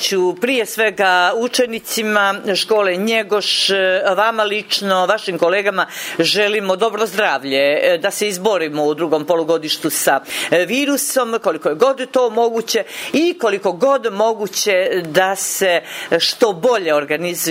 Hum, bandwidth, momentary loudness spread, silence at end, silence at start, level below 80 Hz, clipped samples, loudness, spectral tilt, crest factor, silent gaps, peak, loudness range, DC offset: none; 16.5 kHz; 4 LU; 0 s; 0 s; -70 dBFS; under 0.1%; -16 LUFS; -2.5 dB/octave; 16 dB; none; 0 dBFS; 1 LU; under 0.1%